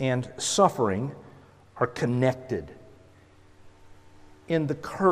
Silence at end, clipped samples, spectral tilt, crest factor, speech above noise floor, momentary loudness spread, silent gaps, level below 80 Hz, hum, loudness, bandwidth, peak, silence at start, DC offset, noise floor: 0 s; under 0.1%; -5 dB/octave; 22 dB; 29 dB; 12 LU; none; -60 dBFS; none; -27 LUFS; 15.5 kHz; -6 dBFS; 0 s; under 0.1%; -54 dBFS